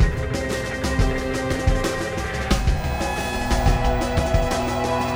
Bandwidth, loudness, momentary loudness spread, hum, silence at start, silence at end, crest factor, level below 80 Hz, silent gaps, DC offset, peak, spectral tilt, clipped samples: over 20 kHz; -23 LUFS; 4 LU; none; 0 s; 0 s; 16 dB; -26 dBFS; none; under 0.1%; -4 dBFS; -5.5 dB/octave; under 0.1%